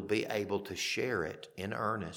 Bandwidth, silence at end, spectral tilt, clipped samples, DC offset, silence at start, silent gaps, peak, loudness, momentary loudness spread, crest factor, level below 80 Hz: 19 kHz; 0 s; -4 dB/octave; under 0.1%; under 0.1%; 0 s; none; -18 dBFS; -35 LUFS; 7 LU; 18 dB; -66 dBFS